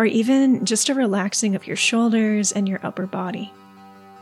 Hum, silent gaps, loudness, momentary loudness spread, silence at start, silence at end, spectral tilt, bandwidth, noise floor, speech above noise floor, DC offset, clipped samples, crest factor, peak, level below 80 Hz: none; none; -20 LUFS; 10 LU; 0 s; 0 s; -3.5 dB/octave; 14 kHz; -45 dBFS; 25 dB; under 0.1%; under 0.1%; 14 dB; -6 dBFS; -84 dBFS